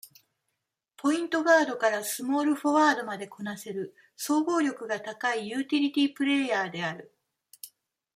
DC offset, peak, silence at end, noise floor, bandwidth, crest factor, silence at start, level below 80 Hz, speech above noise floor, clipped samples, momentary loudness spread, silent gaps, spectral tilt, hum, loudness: under 0.1%; -8 dBFS; 0.5 s; -82 dBFS; 16 kHz; 20 dB; 0.05 s; -82 dBFS; 55 dB; under 0.1%; 15 LU; none; -3.5 dB/octave; none; -27 LUFS